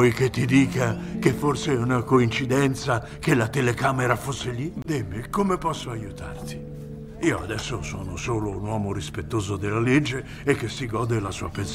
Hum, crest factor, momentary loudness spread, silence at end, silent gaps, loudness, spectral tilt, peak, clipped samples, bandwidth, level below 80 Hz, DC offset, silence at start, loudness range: none; 20 dB; 11 LU; 0 s; none; -25 LUFS; -6 dB/octave; -4 dBFS; under 0.1%; 16 kHz; -44 dBFS; under 0.1%; 0 s; 7 LU